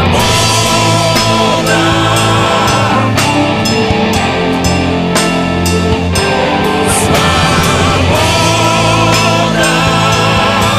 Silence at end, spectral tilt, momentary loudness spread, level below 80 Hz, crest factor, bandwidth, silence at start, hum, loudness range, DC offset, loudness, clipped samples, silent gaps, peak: 0 s; -4 dB/octave; 3 LU; -28 dBFS; 10 dB; 16 kHz; 0 s; none; 2 LU; under 0.1%; -10 LUFS; under 0.1%; none; 0 dBFS